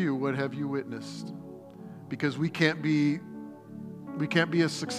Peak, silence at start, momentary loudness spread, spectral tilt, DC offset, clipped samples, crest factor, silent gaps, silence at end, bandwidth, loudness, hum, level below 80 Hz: -8 dBFS; 0 s; 18 LU; -6 dB/octave; under 0.1%; under 0.1%; 22 dB; none; 0 s; 13.5 kHz; -29 LUFS; none; -74 dBFS